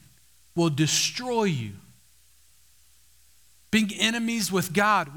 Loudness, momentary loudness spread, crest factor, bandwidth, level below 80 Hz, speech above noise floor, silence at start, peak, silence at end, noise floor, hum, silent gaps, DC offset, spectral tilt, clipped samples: -24 LUFS; 7 LU; 22 dB; over 20 kHz; -62 dBFS; 36 dB; 0.55 s; -6 dBFS; 0 s; -60 dBFS; none; none; 0.1%; -3.5 dB/octave; under 0.1%